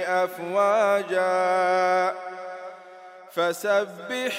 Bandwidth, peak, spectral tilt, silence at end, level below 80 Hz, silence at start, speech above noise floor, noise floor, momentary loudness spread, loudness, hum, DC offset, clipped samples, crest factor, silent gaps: 16 kHz; -10 dBFS; -3.5 dB/octave; 0 s; -88 dBFS; 0 s; 22 dB; -45 dBFS; 16 LU; -23 LUFS; none; under 0.1%; under 0.1%; 16 dB; none